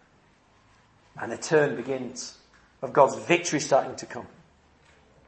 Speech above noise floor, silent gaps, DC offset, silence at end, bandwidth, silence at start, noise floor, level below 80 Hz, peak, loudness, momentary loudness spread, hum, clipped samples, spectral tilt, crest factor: 35 dB; none; under 0.1%; 1 s; 8.8 kHz; 1.15 s; -61 dBFS; -68 dBFS; -4 dBFS; -25 LUFS; 18 LU; none; under 0.1%; -4 dB/octave; 24 dB